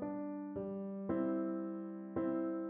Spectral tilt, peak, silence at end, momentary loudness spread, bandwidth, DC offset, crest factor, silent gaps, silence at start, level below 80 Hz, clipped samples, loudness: -10 dB/octave; -26 dBFS; 0 s; 6 LU; 3.4 kHz; under 0.1%; 14 dB; none; 0 s; -72 dBFS; under 0.1%; -40 LUFS